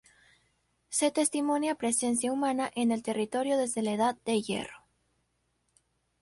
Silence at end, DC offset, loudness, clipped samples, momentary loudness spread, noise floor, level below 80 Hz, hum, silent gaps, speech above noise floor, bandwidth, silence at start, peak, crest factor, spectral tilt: 1.45 s; under 0.1%; -29 LUFS; under 0.1%; 4 LU; -76 dBFS; -72 dBFS; none; none; 47 dB; 11.5 kHz; 0.9 s; -14 dBFS; 16 dB; -3.5 dB/octave